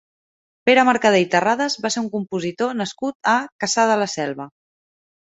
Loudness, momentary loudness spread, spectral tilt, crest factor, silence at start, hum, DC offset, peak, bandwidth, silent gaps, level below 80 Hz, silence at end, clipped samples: -19 LUFS; 11 LU; -3.5 dB/octave; 18 dB; 0.65 s; none; under 0.1%; -2 dBFS; 8.4 kHz; 3.15-3.20 s, 3.52-3.59 s; -66 dBFS; 0.8 s; under 0.1%